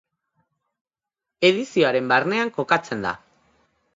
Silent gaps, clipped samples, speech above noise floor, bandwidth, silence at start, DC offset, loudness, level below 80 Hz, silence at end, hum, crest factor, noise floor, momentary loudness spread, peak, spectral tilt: none; under 0.1%; 67 dB; 7.8 kHz; 1.4 s; under 0.1%; -21 LUFS; -66 dBFS; 0.8 s; none; 24 dB; -87 dBFS; 9 LU; 0 dBFS; -5 dB/octave